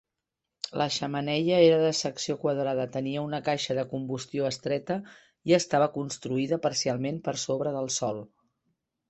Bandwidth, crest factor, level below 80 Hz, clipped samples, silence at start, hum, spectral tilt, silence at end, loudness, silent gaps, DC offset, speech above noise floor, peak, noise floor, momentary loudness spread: 8.4 kHz; 20 dB; -68 dBFS; under 0.1%; 0.65 s; none; -4.5 dB/octave; 0.85 s; -28 LUFS; none; under 0.1%; 59 dB; -8 dBFS; -86 dBFS; 11 LU